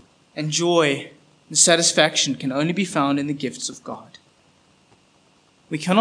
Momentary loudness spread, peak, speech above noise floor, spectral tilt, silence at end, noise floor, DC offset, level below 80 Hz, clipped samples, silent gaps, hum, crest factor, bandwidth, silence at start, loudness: 20 LU; 0 dBFS; 38 dB; -3 dB/octave; 0 s; -58 dBFS; under 0.1%; -74 dBFS; under 0.1%; none; none; 22 dB; 10.5 kHz; 0.35 s; -20 LUFS